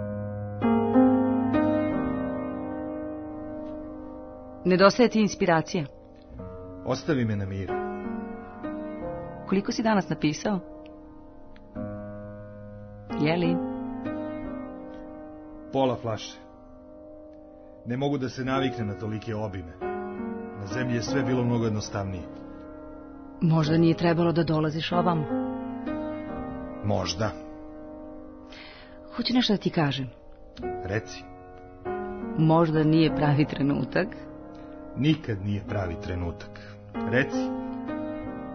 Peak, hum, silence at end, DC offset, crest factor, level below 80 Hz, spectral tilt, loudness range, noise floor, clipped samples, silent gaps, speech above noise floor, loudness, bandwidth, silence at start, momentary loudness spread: -4 dBFS; none; 0 s; under 0.1%; 24 dB; -50 dBFS; -6.5 dB/octave; 7 LU; -47 dBFS; under 0.1%; none; 22 dB; -27 LUFS; 6.6 kHz; 0 s; 21 LU